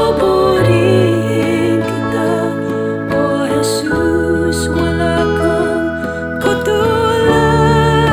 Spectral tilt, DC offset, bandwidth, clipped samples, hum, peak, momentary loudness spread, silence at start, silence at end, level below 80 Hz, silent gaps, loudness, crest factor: -6 dB/octave; 0.1%; 19.5 kHz; under 0.1%; none; 0 dBFS; 7 LU; 0 s; 0 s; -32 dBFS; none; -14 LUFS; 12 dB